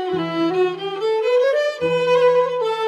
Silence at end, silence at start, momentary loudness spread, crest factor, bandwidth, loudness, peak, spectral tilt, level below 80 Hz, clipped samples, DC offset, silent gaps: 0 s; 0 s; 6 LU; 14 dB; 10.5 kHz; -19 LUFS; -6 dBFS; -5.5 dB/octave; -68 dBFS; under 0.1%; under 0.1%; none